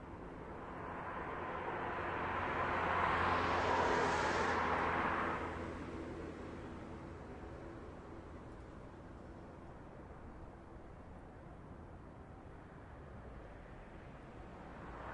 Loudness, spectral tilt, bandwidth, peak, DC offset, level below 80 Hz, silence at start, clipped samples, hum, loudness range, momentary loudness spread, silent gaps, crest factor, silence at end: -39 LUFS; -5.5 dB/octave; 11 kHz; -22 dBFS; under 0.1%; -58 dBFS; 0 s; under 0.1%; none; 19 LU; 20 LU; none; 20 dB; 0 s